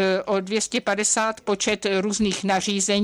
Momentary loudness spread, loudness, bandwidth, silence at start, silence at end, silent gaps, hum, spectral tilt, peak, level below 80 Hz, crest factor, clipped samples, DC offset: 3 LU; -22 LUFS; 13 kHz; 0 s; 0 s; none; none; -3 dB/octave; -8 dBFS; -54 dBFS; 14 dB; under 0.1%; under 0.1%